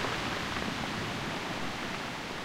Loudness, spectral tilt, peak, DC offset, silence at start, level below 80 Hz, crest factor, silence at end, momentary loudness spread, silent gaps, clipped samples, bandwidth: -34 LUFS; -4 dB/octave; -18 dBFS; under 0.1%; 0 s; -52 dBFS; 18 dB; 0 s; 3 LU; none; under 0.1%; 16 kHz